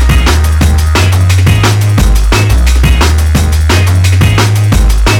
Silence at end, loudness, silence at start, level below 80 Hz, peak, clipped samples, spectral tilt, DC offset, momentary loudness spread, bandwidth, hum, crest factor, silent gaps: 0 s; -8 LUFS; 0 s; -10 dBFS; 0 dBFS; 0.4%; -5 dB/octave; under 0.1%; 2 LU; 17.5 kHz; none; 6 dB; none